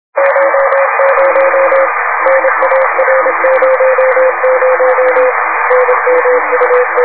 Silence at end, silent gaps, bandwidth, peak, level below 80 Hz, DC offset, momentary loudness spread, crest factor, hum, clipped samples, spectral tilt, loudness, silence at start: 0 s; none; 4 kHz; 0 dBFS; -62 dBFS; 2%; 2 LU; 10 dB; none; 0.3%; -5.5 dB/octave; -9 LUFS; 0.15 s